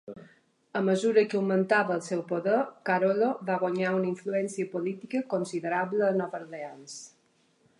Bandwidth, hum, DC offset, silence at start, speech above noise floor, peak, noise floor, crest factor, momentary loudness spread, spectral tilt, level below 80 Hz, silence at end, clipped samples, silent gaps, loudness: 11 kHz; none; under 0.1%; 0.05 s; 40 dB; -10 dBFS; -68 dBFS; 18 dB; 16 LU; -6 dB/octave; -80 dBFS; 0.7 s; under 0.1%; none; -28 LUFS